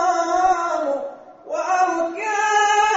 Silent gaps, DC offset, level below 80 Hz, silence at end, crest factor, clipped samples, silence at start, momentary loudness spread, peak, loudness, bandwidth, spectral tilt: none; under 0.1%; -56 dBFS; 0 s; 14 dB; under 0.1%; 0 s; 11 LU; -6 dBFS; -20 LUFS; 8 kHz; 1 dB/octave